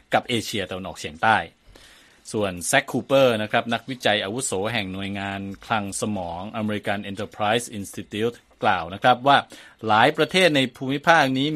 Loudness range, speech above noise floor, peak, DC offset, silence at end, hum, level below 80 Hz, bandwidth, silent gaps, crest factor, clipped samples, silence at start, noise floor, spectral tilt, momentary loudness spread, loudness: 6 LU; 28 dB; 0 dBFS; under 0.1%; 0 s; none; -58 dBFS; 15 kHz; none; 22 dB; under 0.1%; 0.1 s; -51 dBFS; -4 dB/octave; 13 LU; -22 LUFS